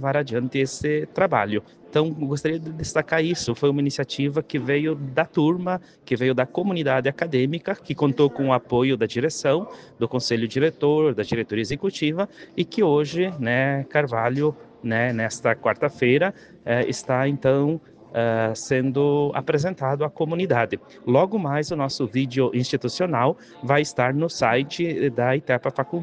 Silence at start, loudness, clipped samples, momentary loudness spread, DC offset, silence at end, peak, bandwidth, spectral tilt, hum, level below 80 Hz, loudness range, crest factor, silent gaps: 0 s; -23 LUFS; under 0.1%; 6 LU; under 0.1%; 0 s; -4 dBFS; 9.8 kHz; -6 dB/octave; none; -58 dBFS; 1 LU; 18 dB; none